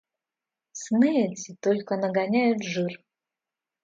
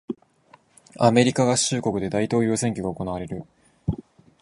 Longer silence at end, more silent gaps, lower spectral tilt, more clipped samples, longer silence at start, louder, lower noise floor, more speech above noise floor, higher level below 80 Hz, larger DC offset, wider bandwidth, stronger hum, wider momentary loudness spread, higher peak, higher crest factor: first, 0.85 s vs 0.4 s; neither; about the same, -5.5 dB/octave vs -5 dB/octave; neither; first, 0.75 s vs 0.1 s; about the same, -25 LUFS vs -23 LUFS; first, -89 dBFS vs -56 dBFS; first, 65 dB vs 35 dB; second, -76 dBFS vs -48 dBFS; neither; second, 7.8 kHz vs 11.5 kHz; neither; second, 14 LU vs 17 LU; second, -10 dBFS vs -2 dBFS; second, 16 dB vs 22 dB